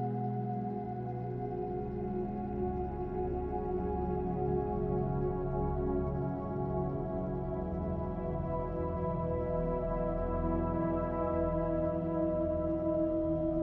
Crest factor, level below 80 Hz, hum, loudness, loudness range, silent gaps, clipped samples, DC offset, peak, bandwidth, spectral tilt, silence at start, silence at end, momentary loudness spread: 12 dB; -44 dBFS; none; -35 LUFS; 4 LU; none; under 0.1%; under 0.1%; -20 dBFS; 4.2 kHz; -12.5 dB/octave; 0 s; 0 s; 5 LU